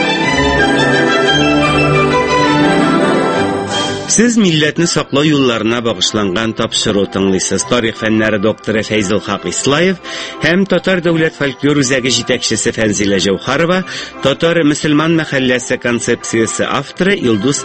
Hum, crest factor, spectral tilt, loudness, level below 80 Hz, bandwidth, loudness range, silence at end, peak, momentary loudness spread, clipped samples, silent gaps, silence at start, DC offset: none; 12 dB; -4 dB/octave; -13 LUFS; -38 dBFS; 8.8 kHz; 3 LU; 0 s; 0 dBFS; 5 LU; under 0.1%; none; 0 s; under 0.1%